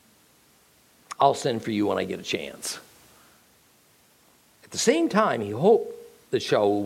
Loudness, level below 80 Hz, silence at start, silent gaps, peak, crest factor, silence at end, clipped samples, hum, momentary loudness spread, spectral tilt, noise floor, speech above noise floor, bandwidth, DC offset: -24 LUFS; -70 dBFS; 1.1 s; none; -6 dBFS; 20 dB; 0 s; under 0.1%; none; 13 LU; -4.5 dB/octave; -60 dBFS; 36 dB; 16.5 kHz; under 0.1%